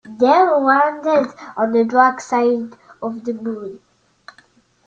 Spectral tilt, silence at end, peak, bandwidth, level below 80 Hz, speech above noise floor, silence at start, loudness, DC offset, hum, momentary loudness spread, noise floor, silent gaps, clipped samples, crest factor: -5 dB/octave; 1.1 s; -2 dBFS; 8.6 kHz; -66 dBFS; 38 dB; 0.05 s; -17 LUFS; under 0.1%; none; 15 LU; -54 dBFS; none; under 0.1%; 16 dB